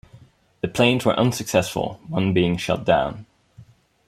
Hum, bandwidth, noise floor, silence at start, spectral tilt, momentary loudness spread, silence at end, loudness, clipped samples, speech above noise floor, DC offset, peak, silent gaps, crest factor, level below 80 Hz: none; 16 kHz; -51 dBFS; 0.15 s; -5.5 dB/octave; 10 LU; 0.45 s; -21 LUFS; under 0.1%; 30 dB; under 0.1%; -2 dBFS; none; 20 dB; -50 dBFS